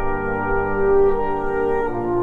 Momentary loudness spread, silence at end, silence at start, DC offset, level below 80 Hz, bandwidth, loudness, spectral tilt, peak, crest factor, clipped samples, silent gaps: 6 LU; 0 s; 0 s; under 0.1%; -30 dBFS; 4 kHz; -20 LUFS; -9.5 dB/octave; -6 dBFS; 12 dB; under 0.1%; none